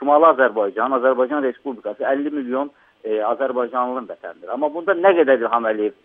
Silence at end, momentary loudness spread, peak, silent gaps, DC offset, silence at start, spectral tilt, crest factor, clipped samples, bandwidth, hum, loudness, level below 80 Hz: 0.15 s; 15 LU; -2 dBFS; none; under 0.1%; 0 s; -8 dB/octave; 18 dB; under 0.1%; 3.8 kHz; none; -19 LUFS; -76 dBFS